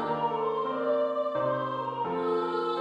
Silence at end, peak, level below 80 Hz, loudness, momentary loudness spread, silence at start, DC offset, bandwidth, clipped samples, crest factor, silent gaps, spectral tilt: 0 s; -16 dBFS; -72 dBFS; -29 LUFS; 3 LU; 0 s; under 0.1%; 8.2 kHz; under 0.1%; 12 dB; none; -7.5 dB/octave